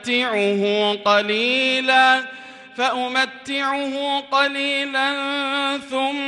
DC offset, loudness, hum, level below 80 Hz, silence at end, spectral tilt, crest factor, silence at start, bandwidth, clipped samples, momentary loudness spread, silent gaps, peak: under 0.1%; -19 LUFS; none; -70 dBFS; 0 s; -3 dB/octave; 16 dB; 0 s; 11.5 kHz; under 0.1%; 7 LU; none; -4 dBFS